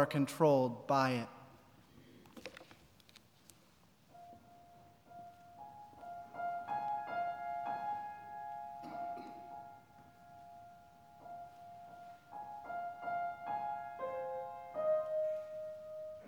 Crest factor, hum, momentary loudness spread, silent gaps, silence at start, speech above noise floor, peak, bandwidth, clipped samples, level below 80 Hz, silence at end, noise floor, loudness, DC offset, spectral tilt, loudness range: 24 dB; none; 26 LU; none; 0 s; 34 dB; -16 dBFS; over 20 kHz; under 0.1%; -80 dBFS; 0 s; -67 dBFS; -39 LUFS; under 0.1%; -6.5 dB/octave; 18 LU